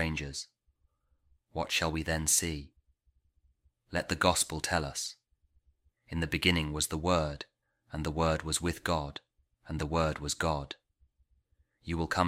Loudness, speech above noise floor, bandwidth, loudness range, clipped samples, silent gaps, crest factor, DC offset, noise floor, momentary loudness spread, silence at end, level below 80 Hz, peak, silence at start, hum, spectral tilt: -31 LUFS; 42 dB; 16 kHz; 3 LU; under 0.1%; none; 24 dB; under 0.1%; -73 dBFS; 15 LU; 0 s; -48 dBFS; -10 dBFS; 0 s; none; -3.5 dB/octave